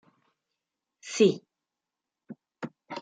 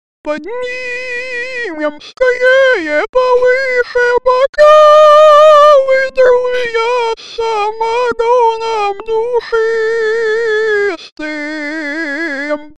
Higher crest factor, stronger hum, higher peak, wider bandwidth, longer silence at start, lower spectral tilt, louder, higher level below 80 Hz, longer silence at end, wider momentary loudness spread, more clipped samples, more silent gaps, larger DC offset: first, 22 dB vs 12 dB; neither; second, -10 dBFS vs 0 dBFS; about the same, 9.4 kHz vs 9.4 kHz; first, 1.05 s vs 0.25 s; first, -5 dB/octave vs -2.5 dB/octave; second, -25 LUFS vs -11 LUFS; second, -82 dBFS vs -46 dBFS; about the same, 0 s vs 0 s; first, 19 LU vs 15 LU; second, under 0.1% vs 0.3%; second, none vs 3.09-3.13 s, 4.49-4.53 s, 11.12-11.16 s; second, under 0.1% vs 1%